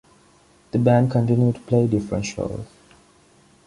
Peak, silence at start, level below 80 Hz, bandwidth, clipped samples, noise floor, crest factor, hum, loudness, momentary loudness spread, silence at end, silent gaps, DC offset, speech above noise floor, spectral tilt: -4 dBFS; 0.75 s; -48 dBFS; 11 kHz; under 0.1%; -55 dBFS; 18 dB; none; -21 LUFS; 12 LU; 1.05 s; none; under 0.1%; 35 dB; -8 dB/octave